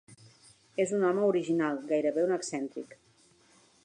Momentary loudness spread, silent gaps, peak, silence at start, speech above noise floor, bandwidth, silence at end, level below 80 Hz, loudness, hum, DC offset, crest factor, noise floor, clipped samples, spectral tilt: 13 LU; none; -16 dBFS; 0.1 s; 35 dB; 11 kHz; 0.9 s; -80 dBFS; -30 LUFS; none; under 0.1%; 16 dB; -64 dBFS; under 0.1%; -5.5 dB/octave